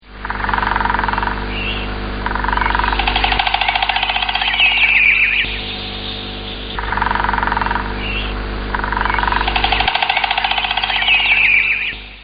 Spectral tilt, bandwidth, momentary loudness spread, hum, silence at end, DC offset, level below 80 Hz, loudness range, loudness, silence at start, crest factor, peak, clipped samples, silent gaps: -0.5 dB/octave; 5.2 kHz; 13 LU; 50 Hz at -30 dBFS; 0 s; under 0.1%; -28 dBFS; 6 LU; -15 LUFS; 0.05 s; 16 dB; 0 dBFS; under 0.1%; none